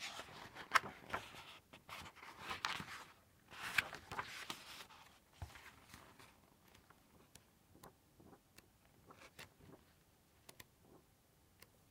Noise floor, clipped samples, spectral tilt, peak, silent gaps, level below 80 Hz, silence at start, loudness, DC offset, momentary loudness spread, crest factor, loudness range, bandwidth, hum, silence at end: -72 dBFS; under 0.1%; -2 dB/octave; -14 dBFS; none; -74 dBFS; 0 s; -45 LUFS; under 0.1%; 27 LU; 36 dB; 19 LU; 16 kHz; none; 0.05 s